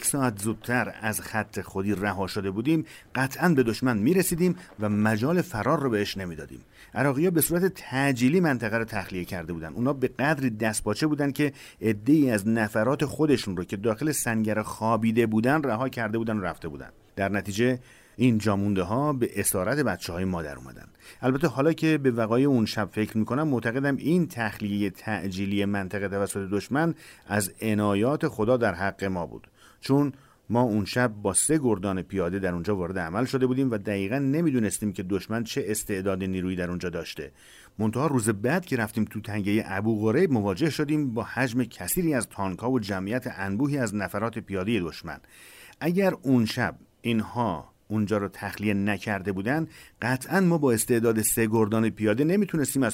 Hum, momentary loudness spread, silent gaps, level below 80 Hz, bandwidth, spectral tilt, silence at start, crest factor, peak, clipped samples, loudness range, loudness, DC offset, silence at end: none; 8 LU; none; -56 dBFS; 16 kHz; -5.5 dB/octave; 0 s; 16 dB; -10 dBFS; under 0.1%; 3 LU; -26 LUFS; under 0.1%; 0 s